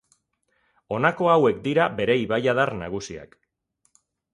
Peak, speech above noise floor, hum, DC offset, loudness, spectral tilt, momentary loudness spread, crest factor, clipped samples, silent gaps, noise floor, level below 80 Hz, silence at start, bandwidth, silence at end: -4 dBFS; 49 dB; none; under 0.1%; -22 LUFS; -6 dB/octave; 14 LU; 20 dB; under 0.1%; none; -71 dBFS; -56 dBFS; 0.9 s; 11 kHz; 1.1 s